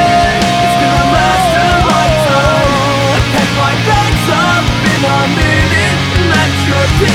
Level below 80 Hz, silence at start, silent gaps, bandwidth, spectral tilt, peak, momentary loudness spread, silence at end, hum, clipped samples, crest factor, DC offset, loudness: -22 dBFS; 0 s; none; 18 kHz; -5 dB/octave; 0 dBFS; 2 LU; 0 s; none; under 0.1%; 10 dB; under 0.1%; -10 LUFS